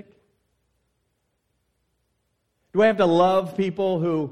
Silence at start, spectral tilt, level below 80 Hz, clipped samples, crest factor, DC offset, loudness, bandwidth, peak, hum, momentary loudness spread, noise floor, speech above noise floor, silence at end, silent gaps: 2.75 s; -7 dB/octave; -64 dBFS; under 0.1%; 18 dB; under 0.1%; -21 LUFS; 12 kHz; -6 dBFS; none; 8 LU; -73 dBFS; 53 dB; 0 s; none